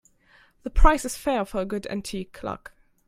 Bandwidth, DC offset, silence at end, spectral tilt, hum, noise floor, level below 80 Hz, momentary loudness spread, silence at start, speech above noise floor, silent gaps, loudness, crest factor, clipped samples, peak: 15.5 kHz; under 0.1%; 0.5 s; -5 dB/octave; none; -59 dBFS; -28 dBFS; 13 LU; 0.65 s; 36 dB; none; -27 LUFS; 22 dB; under 0.1%; -2 dBFS